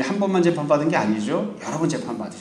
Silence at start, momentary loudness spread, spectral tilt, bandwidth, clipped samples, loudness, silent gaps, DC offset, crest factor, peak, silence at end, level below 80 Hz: 0 s; 8 LU; -6 dB/octave; 11 kHz; under 0.1%; -22 LUFS; none; under 0.1%; 16 dB; -6 dBFS; 0 s; -64 dBFS